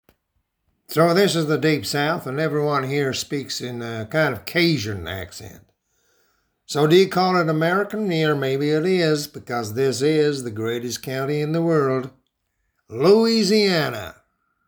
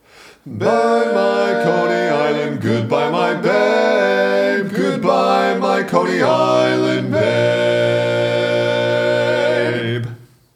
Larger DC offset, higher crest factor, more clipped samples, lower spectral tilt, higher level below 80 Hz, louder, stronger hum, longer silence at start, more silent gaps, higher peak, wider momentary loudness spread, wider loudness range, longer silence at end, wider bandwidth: neither; about the same, 18 dB vs 16 dB; neither; about the same, -5.5 dB/octave vs -6 dB/octave; first, -58 dBFS vs -66 dBFS; second, -21 LUFS vs -16 LUFS; neither; first, 0.9 s vs 0.25 s; neither; second, -4 dBFS vs 0 dBFS; first, 11 LU vs 4 LU; first, 4 LU vs 1 LU; first, 0.55 s vs 0.3 s; first, over 20 kHz vs 14.5 kHz